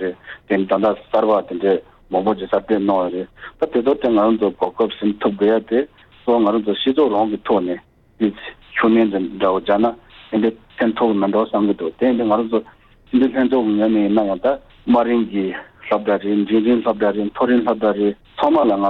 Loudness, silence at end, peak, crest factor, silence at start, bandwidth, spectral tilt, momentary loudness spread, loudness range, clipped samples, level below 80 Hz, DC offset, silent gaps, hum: -18 LUFS; 0 s; -4 dBFS; 14 dB; 0 s; 4.6 kHz; -8.5 dB/octave; 8 LU; 1 LU; under 0.1%; -52 dBFS; under 0.1%; none; none